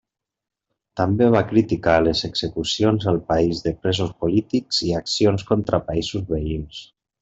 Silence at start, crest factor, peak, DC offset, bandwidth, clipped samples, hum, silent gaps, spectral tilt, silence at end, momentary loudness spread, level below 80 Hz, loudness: 0.95 s; 20 dB; -2 dBFS; under 0.1%; 8.2 kHz; under 0.1%; none; none; -5.5 dB/octave; 0.35 s; 8 LU; -42 dBFS; -21 LUFS